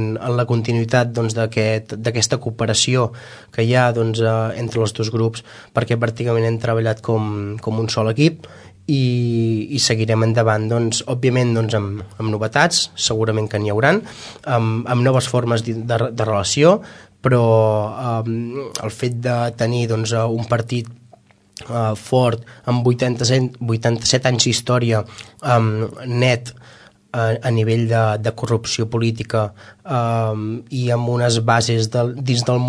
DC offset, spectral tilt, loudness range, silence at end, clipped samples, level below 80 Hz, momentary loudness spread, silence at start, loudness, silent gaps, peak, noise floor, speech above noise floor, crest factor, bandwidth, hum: under 0.1%; -5 dB/octave; 3 LU; 0 s; under 0.1%; -54 dBFS; 8 LU; 0 s; -19 LUFS; none; 0 dBFS; -50 dBFS; 32 dB; 18 dB; 11 kHz; none